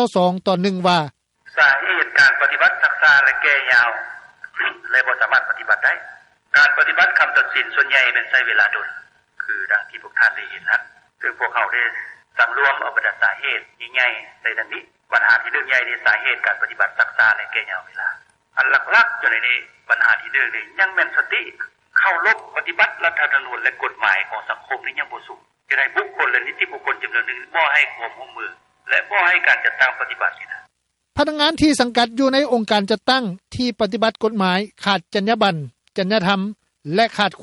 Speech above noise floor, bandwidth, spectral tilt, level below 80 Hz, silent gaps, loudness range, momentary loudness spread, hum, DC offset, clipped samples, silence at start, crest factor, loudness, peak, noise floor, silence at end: 47 dB; 12 kHz; -4 dB/octave; -58 dBFS; none; 5 LU; 12 LU; none; under 0.1%; under 0.1%; 0 s; 18 dB; -17 LUFS; -2 dBFS; -65 dBFS; 0 s